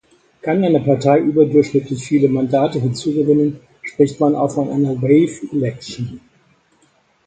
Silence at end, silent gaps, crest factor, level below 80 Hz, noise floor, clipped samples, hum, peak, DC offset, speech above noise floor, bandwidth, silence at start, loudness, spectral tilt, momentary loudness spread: 1.1 s; none; 16 dB; -56 dBFS; -58 dBFS; under 0.1%; none; -2 dBFS; under 0.1%; 42 dB; 9.2 kHz; 0.45 s; -16 LUFS; -7.5 dB/octave; 14 LU